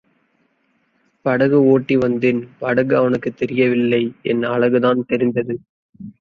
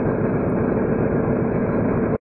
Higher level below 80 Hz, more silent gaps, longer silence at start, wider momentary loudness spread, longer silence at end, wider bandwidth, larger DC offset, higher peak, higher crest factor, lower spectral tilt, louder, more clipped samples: second, -58 dBFS vs -38 dBFS; first, 5.69-5.93 s vs none; first, 1.25 s vs 0 s; first, 8 LU vs 1 LU; about the same, 0.1 s vs 0.15 s; first, 6.4 kHz vs 2.9 kHz; neither; first, -2 dBFS vs -8 dBFS; about the same, 16 dB vs 12 dB; second, -8.5 dB/octave vs -13.5 dB/octave; first, -17 LUFS vs -21 LUFS; neither